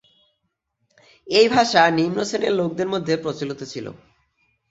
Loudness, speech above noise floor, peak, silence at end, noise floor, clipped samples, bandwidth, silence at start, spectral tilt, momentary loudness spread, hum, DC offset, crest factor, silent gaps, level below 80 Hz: -20 LUFS; 55 dB; -2 dBFS; 0.75 s; -75 dBFS; under 0.1%; 8 kHz; 1.25 s; -4.5 dB/octave; 16 LU; none; under 0.1%; 20 dB; none; -62 dBFS